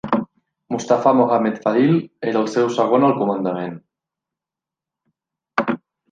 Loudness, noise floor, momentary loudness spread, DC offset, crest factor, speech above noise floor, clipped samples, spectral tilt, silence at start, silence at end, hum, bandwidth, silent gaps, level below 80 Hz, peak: -19 LUFS; -88 dBFS; 12 LU; under 0.1%; 18 dB; 70 dB; under 0.1%; -7 dB/octave; 0.05 s; 0.35 s; none; 9.2 kHz; none; -64 dBFS; -2 dBFS